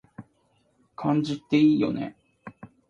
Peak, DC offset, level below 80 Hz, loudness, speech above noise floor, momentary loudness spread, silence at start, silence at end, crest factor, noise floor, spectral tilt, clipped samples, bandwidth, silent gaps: -10 dBFS; under 0.1%; -66 dBFS; -24 LUFS; 44 dB; 21 LU; 0.2 s; 0.25 s; 16 dB; -67 dBFS; -7.5 dB/octave; under 0.1%; 7.4 kHz; none